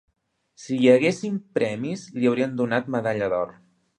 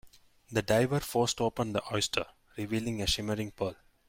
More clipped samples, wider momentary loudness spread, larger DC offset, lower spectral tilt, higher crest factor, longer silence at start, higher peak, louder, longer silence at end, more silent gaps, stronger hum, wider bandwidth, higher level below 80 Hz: neither; first, 13 LU vs 9 LU; neither; first, -6 dB/octave vs -4.5 dB/octave; about the same, 20 dB vs 20 dB; first, 0.6 s vs 0.05 s; first, -4 dBFS vs -12 dBFS; first, -23 LUFS vs -31 LUFS; first, 0.5 s vs 0.35 s; neither; neither; second, 9.8 kHz vs 16.5 kHz; second, -66 dBFS vs -52 dBFS